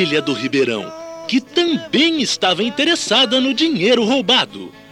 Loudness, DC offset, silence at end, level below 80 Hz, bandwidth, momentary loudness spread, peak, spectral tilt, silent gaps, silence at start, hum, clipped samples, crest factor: -16 LUFS; under 0.1%; 0.1 s; -62 dBFS; 12.5 kHz; 9 LU; -4 dBFS; -3 dB/octave; none; 0 s; none; under 0.1%; 14 dB